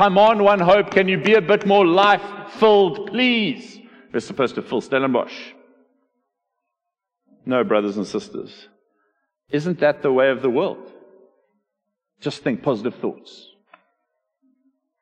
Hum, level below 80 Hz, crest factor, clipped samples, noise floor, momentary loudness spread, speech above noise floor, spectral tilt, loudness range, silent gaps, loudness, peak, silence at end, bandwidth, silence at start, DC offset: none; -62 dBFS; 18 dB; under 0.1%; -83 dBFS; 17 LU; 64 dB; -6 dB/octave; 13 LU; none; -19 LUFS; -2 dBFS; 1.9 s; 9.2 kHz; 0 s; under 0.1%